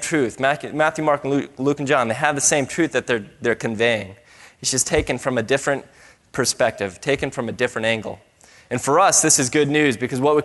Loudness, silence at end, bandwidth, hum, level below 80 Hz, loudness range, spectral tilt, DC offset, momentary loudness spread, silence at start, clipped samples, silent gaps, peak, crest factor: -20 LUFS; 0 s; 12 kHz; none; -48 dBFS; 4 LU; -3 dB/octave; under 0.1%; 10 LU; 0 s; under 0.1%; none; 0 dBFS; 20 dB